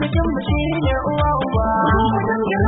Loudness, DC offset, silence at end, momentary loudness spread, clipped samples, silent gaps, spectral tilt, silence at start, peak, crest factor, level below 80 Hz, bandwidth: -19 LUFS; under 0.1%; 0 s; 4 LU; under 0.1%; none; -12 dB/octave; 0 s; -6 dBFS; 12 dB; -28 dBFS; 4.1 kHz